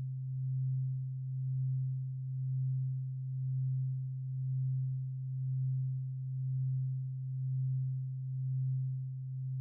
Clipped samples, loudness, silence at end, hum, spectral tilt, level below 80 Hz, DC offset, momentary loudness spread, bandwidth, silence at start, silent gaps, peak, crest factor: under 0.1%; -37 LUFS; 0 s; none; -31.5 dB/octave; -72 dBFS; under 0.1%; 4 LU; 0.3 kHz; 0 s; none; -30 dBFS; 6 dB